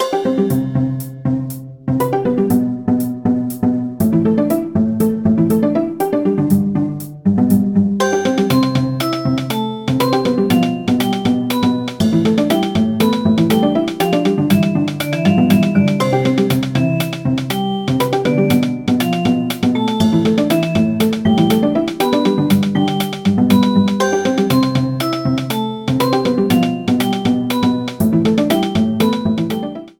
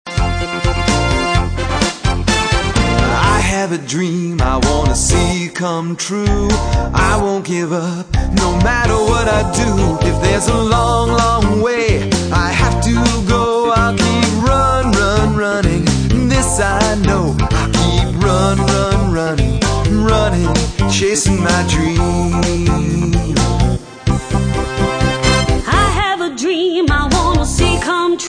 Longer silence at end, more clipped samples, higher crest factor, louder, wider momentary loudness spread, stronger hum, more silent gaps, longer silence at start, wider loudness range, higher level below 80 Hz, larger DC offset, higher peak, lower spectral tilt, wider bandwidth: about the same, 0.1 s vs 0 s; neither; about the same, 14 dB vs 14 dB; about the same, -16 LUFS vs -14 LUFS; about the same, 5 LU vs 5 LU; neither; neither; about the same, 0 s vs 0.05 s; about the same, 2 LU vs 2 LU; second, -48 dBFS vs -20 dBFS; neither; about the same, 0 dBFS vs 0 dBFS; first, -6.5 dB/octave vs -5 dB/octave; first, 19.5 kHz vs 10.5 kHz